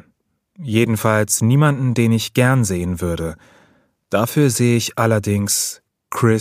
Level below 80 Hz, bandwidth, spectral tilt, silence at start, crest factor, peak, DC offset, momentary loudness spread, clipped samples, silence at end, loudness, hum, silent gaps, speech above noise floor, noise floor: -46 dBFS; 15.5 kHz; -5 dB/octave; 0.6 s; 18 dB; 0 dBFS; under 0.1%; 9 LU; under 0.1%; 0 s; -17 LUFS; none; none; 47 dB; -64 dBFS